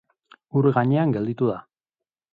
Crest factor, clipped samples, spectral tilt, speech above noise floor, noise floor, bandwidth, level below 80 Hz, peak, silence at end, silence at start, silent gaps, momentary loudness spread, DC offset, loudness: 18 dB; under 0.1%; -11 dB/octave; 68 dB; -89 dBFS; 4.6 kHz; -64 dBFS; -6 dBFS; 0.75 s; 0.55 s; none; 7 LU; under 0.1%; -22 LUFS